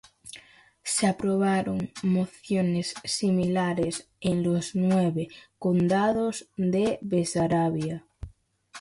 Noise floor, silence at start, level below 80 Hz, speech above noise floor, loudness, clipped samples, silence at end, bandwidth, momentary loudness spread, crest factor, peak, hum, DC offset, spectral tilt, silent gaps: -54 dBFS; 0.25 s; -56 dBFS; 29 dB; -26 LUFS; under 0.1%; 0 s; 11.5 kHz; 14 LU; 16 dB; -12 dBFS; none; under 0.1%; -5.5 dB/octave; none